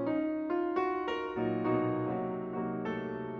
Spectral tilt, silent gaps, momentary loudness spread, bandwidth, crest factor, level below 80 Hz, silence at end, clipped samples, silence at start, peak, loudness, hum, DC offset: -8.5 dB/octave; none; 5 LU; 6.6 kHz; 14 dB; -64 dBFS; 0 s; under 0.1%; 0 s; -18 dBFS; -33 LUFS; none; under 0.1%